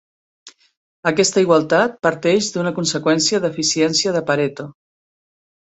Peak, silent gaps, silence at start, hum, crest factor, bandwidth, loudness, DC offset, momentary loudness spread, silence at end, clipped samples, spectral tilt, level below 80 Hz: -2 dBFS; 0.77-1.03 s; 0.45 s; none; 18 dB; 8.4 kHz; -17 LUFS; under 0.1%; 7 LU; 1.05 s; under 0.1%; -3.5 dB/octave; -60 dBFS